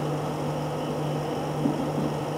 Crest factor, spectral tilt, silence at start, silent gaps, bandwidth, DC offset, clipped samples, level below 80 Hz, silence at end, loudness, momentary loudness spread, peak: 16 dB; -7 dB/octave; 0 s; none; 16 kHz; under 0.1%; under 0.1%; -54 dBFS; 0 s; -29 LUFS; 3 LU; -12 dBFS